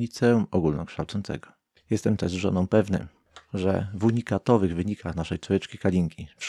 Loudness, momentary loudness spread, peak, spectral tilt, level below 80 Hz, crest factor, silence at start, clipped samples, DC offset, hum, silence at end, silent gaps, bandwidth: -26 LUFS; 9 LU; -6 dBFS; -7 dB/octave; -50 dBFS; 20 dB; 0 s; under 0.1%; under 0.1%; none; 0 s; none; 12.5 kHz